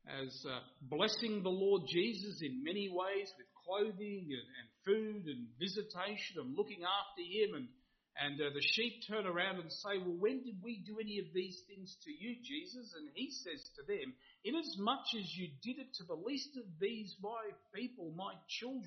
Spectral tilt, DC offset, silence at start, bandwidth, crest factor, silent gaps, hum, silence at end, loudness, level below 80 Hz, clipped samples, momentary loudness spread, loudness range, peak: -2.5 dB/octave; under 0.1%; 0.05 s; 6.4 kHz; 22 dB; none; none; 0 s; -41 LUFS; -82 dBFS; under 0.1%; 12 LU; 7 LU; -20 dBFS